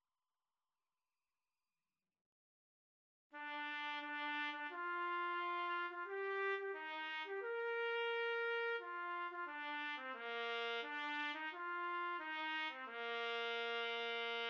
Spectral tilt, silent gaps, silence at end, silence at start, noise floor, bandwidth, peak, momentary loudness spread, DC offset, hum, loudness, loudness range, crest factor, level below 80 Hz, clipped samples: 4 dB/octave; none; 0 s; 3.35 s; under -90 dBFS; 7.4 kHz; -30 dBFS; 5 LU; under 0.1%; none; -43 LUFS; 5 LU; 14 dB; under -90 dBFS; under 0.1%